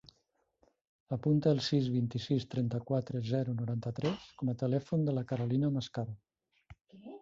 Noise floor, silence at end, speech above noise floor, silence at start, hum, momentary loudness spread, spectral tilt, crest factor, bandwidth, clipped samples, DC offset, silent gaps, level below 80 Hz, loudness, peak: -77 dBFS; 0.05 s; 45 dB; 1.1 s; none; 11 LU; -8 dB/octave; 18 dB; 7.6 kHz; under 0.1%; under 0.1%; none; -66 dBFS; -34 LUFS; -16 dBFS